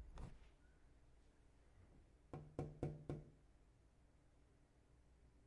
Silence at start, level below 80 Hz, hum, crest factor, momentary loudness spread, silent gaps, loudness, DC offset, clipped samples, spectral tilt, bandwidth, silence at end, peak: 0 s; -66 dBFS; none; 28 dB; 14 LU; none; -54 LUFS; under 0.1%; under 0.1%; -8.5 dB/octave; 10.5 kHz; 0 s; -30 dBFS